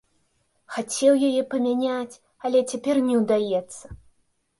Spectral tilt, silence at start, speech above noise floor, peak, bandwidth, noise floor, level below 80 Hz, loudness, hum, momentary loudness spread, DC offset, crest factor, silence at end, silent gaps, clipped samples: -4.5 dB/octave; 0.7 s; 46 dB; -8 dBFS; 11.5 kHz; -68 dBFS; -58 dBFS; -23 LUFS; none; 14 LU; under 0.1%; 16 dB; 0.65 s; none; under 0.1%